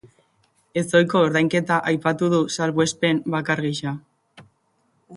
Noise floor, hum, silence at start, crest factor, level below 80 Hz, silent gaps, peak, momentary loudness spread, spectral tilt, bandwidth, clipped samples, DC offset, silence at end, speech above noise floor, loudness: -66 dBFS; none; 0.75 s; 20 dB; -62 dBFS; none; -2 dBFS; 10 LU; -5 dB/octave; 11.5 kHz; under 0.1%; under 0.1%; 0 s; 46 dB; -21 LUFS